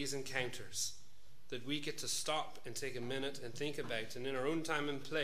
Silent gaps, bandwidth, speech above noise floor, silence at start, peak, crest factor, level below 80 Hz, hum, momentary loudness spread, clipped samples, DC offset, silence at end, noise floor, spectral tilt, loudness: none; 15.5 kHz; 25 dB; 0 s; -20 dBFS; 20 dB; -72 dBFS; none; 7 LU; under 0.1%; 0.7%; 0 s; -66 dBFS; -3 dB/octave; -40 LUFS